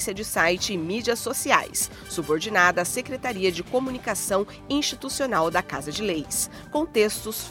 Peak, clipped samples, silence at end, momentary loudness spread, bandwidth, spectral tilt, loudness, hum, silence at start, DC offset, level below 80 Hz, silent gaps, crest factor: -2 dBFS; under 0.1%; 0 s; 7 LU; 17.5 kHz; -2.5 dB/octave; -24 LUFS; none; 0 s; under 0.1%; -52 dBFS; none; 24 dB